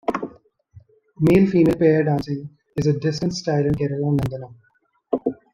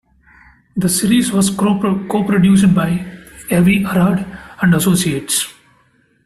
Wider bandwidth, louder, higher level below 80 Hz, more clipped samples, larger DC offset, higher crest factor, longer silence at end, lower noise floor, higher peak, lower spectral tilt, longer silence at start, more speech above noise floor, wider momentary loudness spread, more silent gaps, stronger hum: about the same, 13 kHz vs 14 kHz; second, -21 LUFS vs -15 LUFS; about the same, -48 dBFS vs -44 dBFS; neither; neither; about the same, 18 dB vs 14 dB; second, 0.2 s vs 0.75 s; second, -50 dBFS vs -56 dBFS; about the same, -4 dBFS vs -2 dBFS; first, -7.5 dB/octave vs -5 dB/octave; second, 0.1 s vs 0.75 s; second, 31 dB vs 42 dB; first, 15 LU vs 11 LU; neither; neither